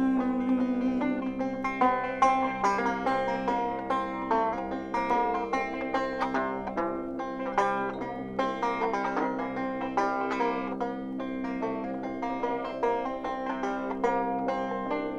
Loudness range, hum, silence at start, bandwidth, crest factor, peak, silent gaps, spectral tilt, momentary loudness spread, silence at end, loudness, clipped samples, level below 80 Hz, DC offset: 4 LU; none; 0 s; 9.4 kHz; 18 dB; -10 dBFS; none; -6 dB/octave; 7 LU; 0 s; -29 LUFS; under 0.1%; -54 dBFS; under 0.1%